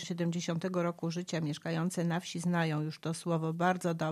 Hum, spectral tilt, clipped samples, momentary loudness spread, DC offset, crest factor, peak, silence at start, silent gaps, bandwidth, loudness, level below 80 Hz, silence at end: none; -6 dB/octave; under 0.1%; 5 LU; under 0.1%; 18 dB; -14 dBFS; 0 s; none; 13.5 kHz; -34 LUFS; -78 dBFS; 0 s